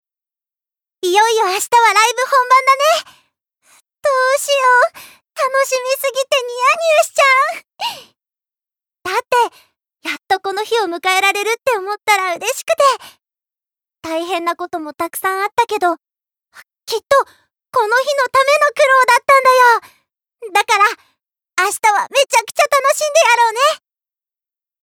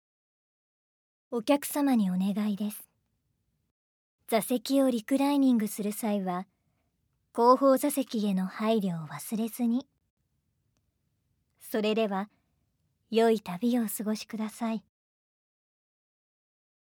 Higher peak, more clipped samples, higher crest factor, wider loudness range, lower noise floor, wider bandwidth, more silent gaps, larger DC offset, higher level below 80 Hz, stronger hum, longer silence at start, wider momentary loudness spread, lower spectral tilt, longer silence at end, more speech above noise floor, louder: first, -2 dBFS vs -10 dBFS; neither; second, 14 dB vs 20 dB; about the same, 7 LU vs 7 LU; first, -88 dBFS vs -77 dBFS; about the same, 20 kHz vs over 20 kHz; second, none vs 3.71-4.19 s, 10.10-10.17 s; neither; first, -68 dBFS vs -82 dBFS; neither; second, 1.05 s vs 1.3 s; about the same, 13 LU vs 11 LU; second, 0 dB/octave vs -5.5 dB/octave; second, 1.05 s vs 2.1 s; first, 74 dB vs 49 dB; first, -14 LUFS vs -28 LUFS